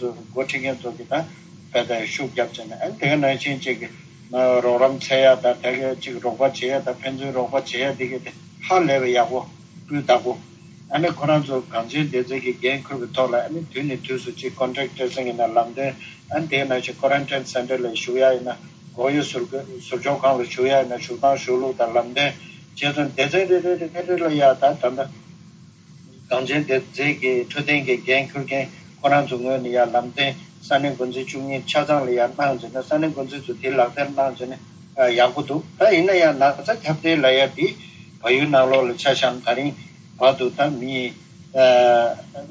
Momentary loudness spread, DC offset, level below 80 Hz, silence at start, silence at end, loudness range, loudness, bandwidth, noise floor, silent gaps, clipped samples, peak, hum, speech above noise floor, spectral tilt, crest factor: 12 LU; under 0.1%; -64 dBFS; 0 s; 0 s; 5 LU; -21 LUFS; 8 kHz; -46 dBFS; none; under 0.1%; -4 dBFS; none; 26 dB; -5 dB/octave; 18 dB